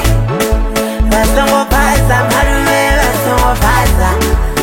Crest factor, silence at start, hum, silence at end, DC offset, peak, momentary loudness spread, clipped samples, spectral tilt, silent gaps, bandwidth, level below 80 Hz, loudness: 10 dB; 0 s; none; 0 s; 0.5%; 0 dBFS; 3 LU; under 0.1%; -4.5 dB/octave; none; 17 kHz; -14 dBFS; -11 LUFS